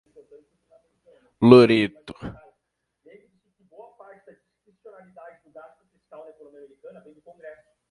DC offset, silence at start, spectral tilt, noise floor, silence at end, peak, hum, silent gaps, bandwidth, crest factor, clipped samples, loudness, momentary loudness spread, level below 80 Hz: under 0.1%; 1.4 s; -7.5 dB/octave; -78 dBFS; 5.6 s; 0 dBFS; none; none; 10 kHz; 24 dB; under 0.1%; -16 LUFS; 32 LU; -60 dBFS